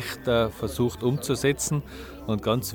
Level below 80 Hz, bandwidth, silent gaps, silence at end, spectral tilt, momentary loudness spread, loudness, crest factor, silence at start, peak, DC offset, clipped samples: -46 dBFS; 19 kHz; none; 0 s; -5 dB/octave; 7 LU; -26 LUFS; 16 dB; 0 s; -10 dBFS; under 0.1%; under 0.1%